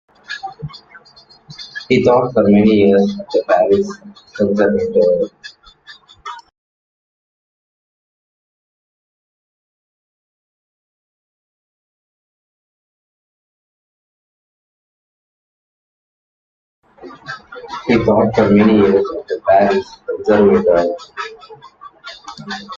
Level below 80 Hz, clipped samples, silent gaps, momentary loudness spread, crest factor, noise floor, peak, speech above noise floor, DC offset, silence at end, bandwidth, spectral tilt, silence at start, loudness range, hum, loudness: -50 dBFS; under 0.1%; 6.58-16.82 s; 21 LU; 18 dB; -46 dBFS; 0 dBFS; 33 dB; under 0.1%; 0 s; 7.4 kHz; -7.5 dB/octave; 0.3 s; 8 LU; none; -14 LUFS